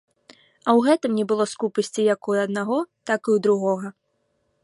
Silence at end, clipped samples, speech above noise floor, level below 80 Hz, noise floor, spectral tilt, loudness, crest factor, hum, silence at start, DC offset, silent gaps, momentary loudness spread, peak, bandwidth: 0.75 s; under 0.1%; 49 dB; -74 dBFS; -71 dBFS; -5.5 dB/octave; -22 LUFS; 18 dB; none; 0.65 s; under 0.1%; none; 7 LU; -4 dBFS; 11.5 kHz